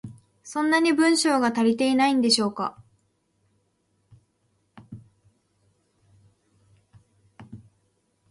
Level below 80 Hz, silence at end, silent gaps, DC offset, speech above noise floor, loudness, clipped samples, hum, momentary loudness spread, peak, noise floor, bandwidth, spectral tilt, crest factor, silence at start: -68 dBFS; 0.75 s; none; under 0.1%; 49 dB; -22 LUFS; under 0.1%; none; 18 LU; -6 dBFS; -70 dBFS; 11.5 kHz; -3 dB/octave; 20 dB; 0.05 s